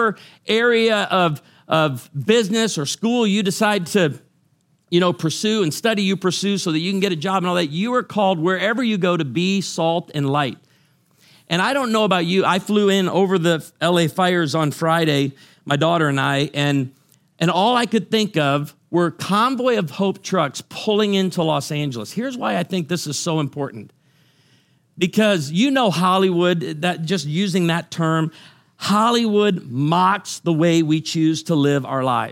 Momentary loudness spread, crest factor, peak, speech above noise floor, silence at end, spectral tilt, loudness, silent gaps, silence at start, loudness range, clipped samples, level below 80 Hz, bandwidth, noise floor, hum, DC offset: 6 LU; 18 dB; -2 dBFS; 43 dB; 0 s; -5 dB/octave; -19 LUFS; none; 0 s; 3 LU; under 0.1%; -68 dBFS; 16.5 kHz; -62 dBFS; none; under 0.1%